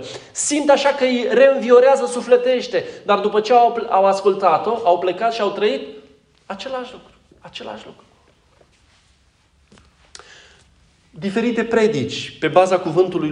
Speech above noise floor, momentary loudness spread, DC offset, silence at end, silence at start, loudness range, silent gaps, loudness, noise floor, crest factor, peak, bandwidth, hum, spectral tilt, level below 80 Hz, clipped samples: 41 dB; 17 LU; under 0.1%; 0 s; 0 s; 19 LU; none; -17 LUFS; -58 dBFS; 18 dB; 0 dBFS; 11 kHz; none; -4 dB/octave; -60 dBFS; under 0.1%